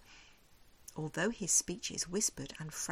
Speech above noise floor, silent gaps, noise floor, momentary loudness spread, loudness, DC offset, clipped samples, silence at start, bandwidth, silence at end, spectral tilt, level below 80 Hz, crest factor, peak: 25 dB; none; -62 dBFS; 15 LU; -34 LUFS; under 0.1%; under 0.1%; 0 s; 16.5 kHz; 0 s; -2.5 dB/octave; -62 dBFS; 22 dB; -18 dBFS